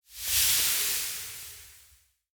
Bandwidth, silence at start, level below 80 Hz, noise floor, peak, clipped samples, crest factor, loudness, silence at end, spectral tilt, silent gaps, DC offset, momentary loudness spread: over 20 kHz; 0.1 s; -56 dBFS; -62 dBFS; -10 dBFS; under 0.1%; 20 dB; -25 LUFS; 0.6 s; 2 dB/octave; none; under 0.1%; 20 LU